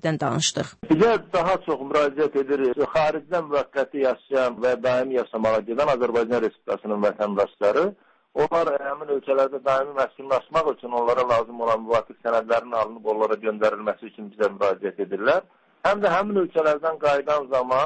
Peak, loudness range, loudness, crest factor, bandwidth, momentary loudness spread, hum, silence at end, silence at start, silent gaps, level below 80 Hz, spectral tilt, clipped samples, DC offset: -10 dBFS; 2 LU; -23 LUFS; 14 dB; 8.8 kHz; 6 LU; none; 0 s; 0 s; none; -58 dBFS; -4.5 dB/octave; under 0.1%; under 0.1%